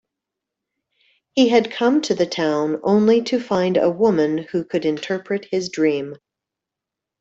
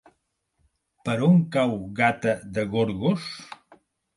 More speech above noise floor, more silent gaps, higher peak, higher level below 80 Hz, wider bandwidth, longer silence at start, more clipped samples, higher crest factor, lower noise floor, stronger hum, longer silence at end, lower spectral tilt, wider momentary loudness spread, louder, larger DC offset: first, 67 dB vs 50 dB; neither; about the same, -4 dBFS vs -6 dBFS; second, -64 dBFS vs -58 dBFS; second, 8 kHz vs 11.5 kHz; first, 1.35 s vs 1.05 s; neither; about the same, 18 dB vs 20 dB; first, -85 dBFS vs -73 dBFS; neither; first, 1.05 s vs 0.6 s; second, -5.5 dB/octave vs -7 dB/octave; second, 8 LU vs 16 LU; first, -19 LUFS vs -24 LUFS; neither